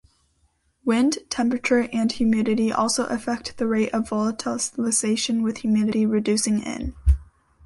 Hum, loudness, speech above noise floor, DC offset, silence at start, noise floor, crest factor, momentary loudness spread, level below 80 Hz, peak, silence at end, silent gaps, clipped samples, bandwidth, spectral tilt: none; -23 LUFS; 44 dB; under 0.1%; 0.85 s; -66 dBFS; 16 dB; 5 LU; -34 dBFS; -8 dBFS; 0.45 s; none; under 0.1%; 11.5 kHz; -4.5 dB/octave